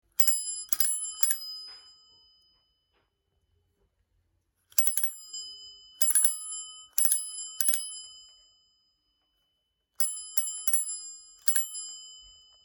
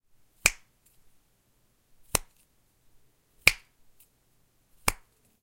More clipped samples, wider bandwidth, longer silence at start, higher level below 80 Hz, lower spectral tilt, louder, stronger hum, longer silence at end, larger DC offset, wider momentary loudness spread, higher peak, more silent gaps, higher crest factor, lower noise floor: neither; first, 19.5 kHz vs 16.5 kHz; second, 0.2 s vs 0.45 s; second, -74 dBFS vs -50 dBFS; second, 3.5 dB/octave vs -0.5 dB/octave; about the same, -25 LUFS vs -27 LUFS; neither; about the same, 0.4 s vs 0.5 s; neither; about the same, 19 LU vs 20 LU; second, -4 dBFS vs 0 dBFS; neither; second, 28 dB vs 34 dB; first, -78 dBFS vs -68 dBFS